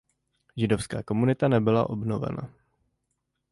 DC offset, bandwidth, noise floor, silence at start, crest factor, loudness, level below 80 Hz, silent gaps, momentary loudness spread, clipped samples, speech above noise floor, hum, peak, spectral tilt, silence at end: under 0.1%; 11.5 kHz; -79 dBFS; 0.55 s; 18 dB; -26 LUFS; -54 dBFS; none; 14 LU; under 0.1%; 54 dB; none; -10 dBFS; -7.5 dB/octave; 1 s